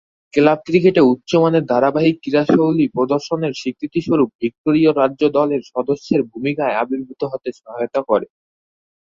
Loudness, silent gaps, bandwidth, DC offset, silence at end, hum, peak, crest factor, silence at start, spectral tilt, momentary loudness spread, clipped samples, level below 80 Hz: -17 LUFS; 4.35-4.39 s, 4.58-4.64 s; 7.4 kHz; under 0.1%; 0.85 s; none; 0 dBFS; 16 dB; 0.35 s; -7 dB/octave; 9 LU; under 0.1%; -58 dBFS